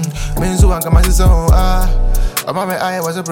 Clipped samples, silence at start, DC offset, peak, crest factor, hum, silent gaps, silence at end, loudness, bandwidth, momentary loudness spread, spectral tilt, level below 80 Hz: under 0.1%; 0 s; under 0.1%; -2 dBFS; 10 dB; none; none; 0 s; -15 LUFS; 17 kHz; 7 LU; -5.5 dB/octave; -14 dBFS